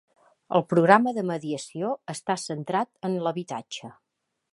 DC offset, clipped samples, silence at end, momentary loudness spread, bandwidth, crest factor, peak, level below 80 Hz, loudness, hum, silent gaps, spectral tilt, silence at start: under 0.1%; under 0.1%; 0.6 s; 15 LU; 11.5 kHz; 26 dB; -2 dBFS; -76 dBFS; -26 LUFS; none; none; -5.5 dB/octave; 0.5 s